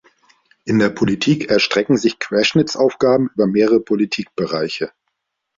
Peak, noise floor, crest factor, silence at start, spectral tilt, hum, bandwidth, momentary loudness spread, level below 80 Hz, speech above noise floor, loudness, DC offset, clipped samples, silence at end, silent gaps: -2 dBFS; -74 dBFS; 16 dB; 0.65 s; -5.5 dB/octave; none; 7.6 kHz; 7 LU; -54 dBFS; 58 dB; -17 LUFS; under 0.1%; under 0.1%; 0.7 s; none